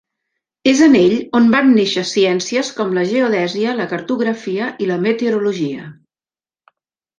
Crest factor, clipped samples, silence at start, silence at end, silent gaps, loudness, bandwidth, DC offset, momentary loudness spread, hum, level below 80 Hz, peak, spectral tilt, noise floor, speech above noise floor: 16 dB; under 0.1%; 0.65 s; 1.25 s; none; -15 LUFS; 9.6 kHz; under 0.1%; 10 LU; none; -60 dBFS; 0 dBFS; -5 dB/octave; under -90 dBFS; over 75 dB